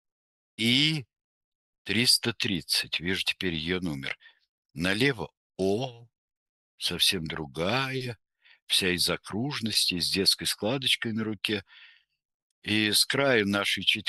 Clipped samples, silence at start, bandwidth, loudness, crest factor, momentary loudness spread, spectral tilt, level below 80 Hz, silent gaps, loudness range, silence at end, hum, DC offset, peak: under 0.1%; 0.6 s; 13 kHz; -26 LUFS; 22 dB; 13 LU; -3 dB/octave; -60 dBFS; 1.24-1.85 s, 4.49-4.63 s, 5.37-5.50 s, 6.18-6.28 s, 6.37-6.78 s, 8.62-8.67 s, 12.25-12.62 s; 4 LU; 0 s; none; under 0.1%; -8 dBFS